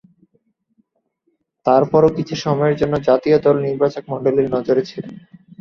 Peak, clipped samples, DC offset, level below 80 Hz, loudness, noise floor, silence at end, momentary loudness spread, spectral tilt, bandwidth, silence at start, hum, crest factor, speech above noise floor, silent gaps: -2 dBFS; under 0.1%; under 0.1%; -52 dBFS; -17 LUFS; -68 dBFS; 0.4 s; 9 LU; -7.5 dB/octave; 6.8 kHz; 1.65 s; none; 16 dB; 52 dB; none